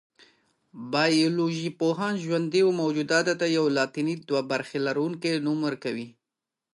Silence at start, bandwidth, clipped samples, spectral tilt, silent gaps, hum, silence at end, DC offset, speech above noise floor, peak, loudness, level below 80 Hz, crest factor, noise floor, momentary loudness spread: 0.75 s; 11.5 kHz; under 0.1%; -5 dB/octave; none; none; 0.65 s; under 0.1%; 62 dB; -10 dBFS; -26 LUFS; -78 dBFS; 16 dB; -88 dBFS; 7 LU